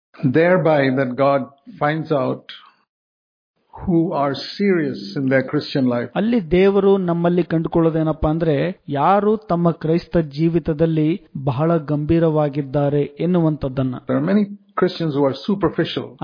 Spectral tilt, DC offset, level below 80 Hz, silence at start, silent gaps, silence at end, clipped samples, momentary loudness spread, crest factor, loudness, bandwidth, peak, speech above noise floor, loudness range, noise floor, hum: -9 dB/octave; under 0.1%; -44 dBFS; 0.2 s; 2.89-3.54 s; 0 s; under 0.1%; 7 LU; 16 dB; -19 LUFS; 5.2 kHz; -2 dBFS; over 72 dB; 5 LU; under -90 dBFS; none